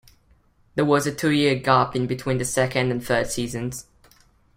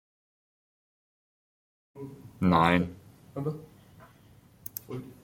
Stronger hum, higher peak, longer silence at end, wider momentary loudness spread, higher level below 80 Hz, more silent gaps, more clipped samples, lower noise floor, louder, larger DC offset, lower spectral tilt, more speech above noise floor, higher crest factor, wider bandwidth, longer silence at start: neither; about the same, -4 dBFS vs -6 dBFS; first, 0.75 s vs 0.1 s; second, 10 LU vs 22 LU; first, -50 dBFS vs -60 dBFS; neither; neither; about the same, -59 dBFS vs -57 dBFS; first, -22 LUFS vs -28 LUFS; neither; second, -5 dB/octave vs -6.5 dB/octave; first, 37 dB vs 29 dB; second, 20 dB vs 26 dB; about the same, 16.5 kHz vs 16.5 kHz; second, 0.75 s vs 1.95 s